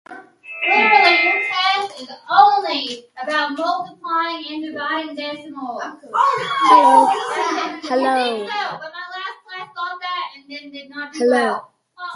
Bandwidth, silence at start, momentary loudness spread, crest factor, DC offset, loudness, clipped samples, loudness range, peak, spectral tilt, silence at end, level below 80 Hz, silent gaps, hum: 11.5 kHz; 0.1 s; 19 LU; 18 dB; under 0.1%; -17 LUFS; under 0.1%; 8 LU; 0 dBFS; -2.5 dB/octave; 0 s; -74 dBFS; none; none